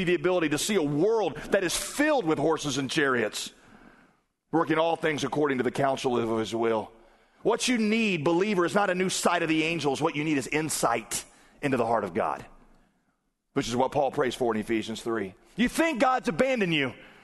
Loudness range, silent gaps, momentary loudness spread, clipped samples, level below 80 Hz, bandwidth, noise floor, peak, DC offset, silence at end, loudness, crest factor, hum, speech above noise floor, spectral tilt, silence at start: 4 LU; none; 7 LU; under 0.1%; -56 dBFS; 12.5 kHz; -74 dBFS; -8 dBFS; under 0.1%; 0.15 s; -27 LUFS; 18 dB; none; 48 dB; -4 dB/octave; 0 s